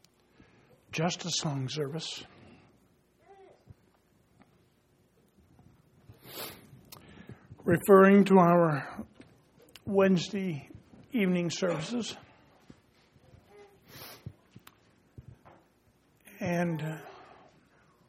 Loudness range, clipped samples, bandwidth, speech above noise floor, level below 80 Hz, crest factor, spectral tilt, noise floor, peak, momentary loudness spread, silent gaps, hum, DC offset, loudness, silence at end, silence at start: 24 LU; under 0.1%; 16 kHz; 41 dB; -68 dBFS; 24 dB; -6 dB/octave; -67 dBFS; -6 dBFS; 29 LU; none; none; under 0.1%; -27 LUFS; 0.95 s; 0.9 s